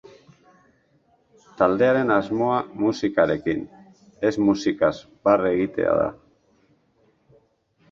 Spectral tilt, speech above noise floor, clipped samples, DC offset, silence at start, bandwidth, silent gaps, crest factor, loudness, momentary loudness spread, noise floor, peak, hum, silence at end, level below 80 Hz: -6.5 dB/octave; 42 dB; under 0.1%; under 0.1%; 1.6 s; 7.4 kHz; none; 20 dB; -22 LUFS; 6 LU; -63 dBFS; -2 dBFS; none; 1.8 s; -56 dBFS